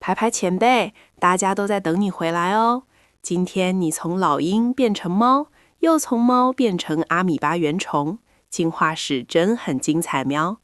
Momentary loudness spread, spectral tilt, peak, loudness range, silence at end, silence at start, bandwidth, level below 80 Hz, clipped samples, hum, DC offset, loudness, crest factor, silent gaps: 7 LU; -5 dB/octave; -4 dBFS; 2 LU; 0.1 s; 0 s; 12.5 kHz; -62 dBFS; under 0.1%; none; under 0.1%; -20 LUFS; 16 dB; none